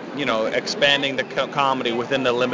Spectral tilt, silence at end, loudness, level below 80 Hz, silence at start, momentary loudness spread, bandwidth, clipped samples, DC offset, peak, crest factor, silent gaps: -3.5 dB/octave; 0 s; -21 LUFS; -60 dBFS; 0 s; 6 LU; 7.6 kHz; under 0.1%; under 0.1%; -4 dBFS; 18 dB; none